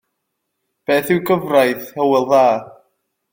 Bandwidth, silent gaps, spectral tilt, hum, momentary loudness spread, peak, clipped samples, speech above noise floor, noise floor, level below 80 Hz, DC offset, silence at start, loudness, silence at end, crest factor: 17 kHz; none; -5.5 dB/octave; none; 6 LU; -2 dBFS; under 0.1%; 59 dB; -75 dBFS; -62 dBFS; under 0.1%; 0.9 s; -16 LUFS; 0.6 s; 16 dB